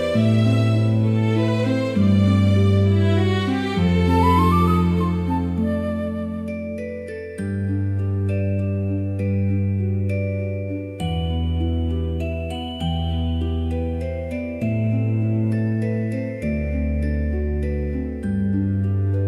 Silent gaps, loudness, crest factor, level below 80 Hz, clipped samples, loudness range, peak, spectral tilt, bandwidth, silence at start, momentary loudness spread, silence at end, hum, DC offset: none; -21 LUFS; 14 dB; -34 dBFS; under 0.1%; 7 LU; -6 dBFS; -8.5 dB/octave; 11.5 kHz; 0 s; 10 LU; 0 s; none; under 0.1%